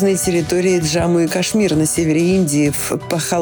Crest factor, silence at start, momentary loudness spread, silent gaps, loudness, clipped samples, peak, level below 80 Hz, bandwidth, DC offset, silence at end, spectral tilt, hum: 10 dB; 0 s; 4 LU; none; -16 LUFS; under 0.1%; -6 dBFS; -42 dBFS; over 20 kHz; under 0.1%; 0 s; -5 dB/octave; none